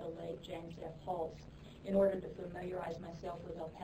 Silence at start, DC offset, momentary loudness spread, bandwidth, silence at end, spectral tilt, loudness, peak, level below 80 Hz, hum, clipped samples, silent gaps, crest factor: 0 s; under 0.1%; 15 LU; 12 kHz; 0 s; -7.5 dB/octave; -41 LUFS; -22 dBFS; -60 dBFS; none; under 0.1%; none; 20 dB